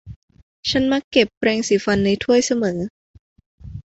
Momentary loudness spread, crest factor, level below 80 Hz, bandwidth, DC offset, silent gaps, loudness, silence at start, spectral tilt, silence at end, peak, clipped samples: 11 LU; 20 dB; -46 dBFS; 8.2 kHz; under 0.1%; 0.16-0.28 s, 0.43-0.63 s, 1.04-1.11 s, 1.37-1.41 s, 2.90-3.36 s, 3.46-3.58 s; -19 LUFS; 0.05 s; -4.5 dB/octave; 0.05 s; -2 dBFS; under 0.1%